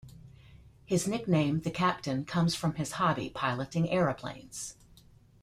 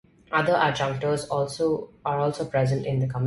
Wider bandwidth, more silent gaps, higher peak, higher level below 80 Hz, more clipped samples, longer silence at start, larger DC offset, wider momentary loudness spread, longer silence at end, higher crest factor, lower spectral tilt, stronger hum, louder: first, 15 kHz vs 11.5 kHz; neither; second, -14 dBFS vs -8 dBFS; about the same, -58 dBFS vs -56 dBFS; neither; second, 0.05 s vs 0.3 s; neither; first, 12 LU vs 5 LU; first, 0.7 s vs 0 s; about the same, 18 dB vs 16 dB; about the same, -5.5 dB/octave vs -6 dB/octave; neither; second, -31 LUFS vs -25 LUFS